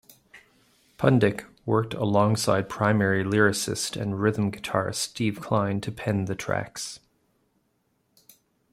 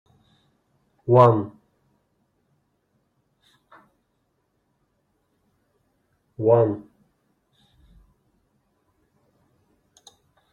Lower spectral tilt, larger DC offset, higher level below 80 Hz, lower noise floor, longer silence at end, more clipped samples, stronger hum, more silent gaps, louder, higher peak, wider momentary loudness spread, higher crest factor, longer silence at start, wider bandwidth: second, -5.5 dB/octave vs -9.5 dB/octave; neither; first, -60 dBFS vs -66 dBFS; about the same, -71 dBFS vs -72 dBFS; second, 1.75 s vs 3.75 s; neither; neither; neither; second, -25 LUFS vs -20 LUFS; second, -6 dBFS vs -2 dBFS; second, 8 LU vs 21 LU; second, 20 dB vs 26 dB; second, 0.35 s vs 1.05 s; first, 15.5 kHz vs 7.2 kHz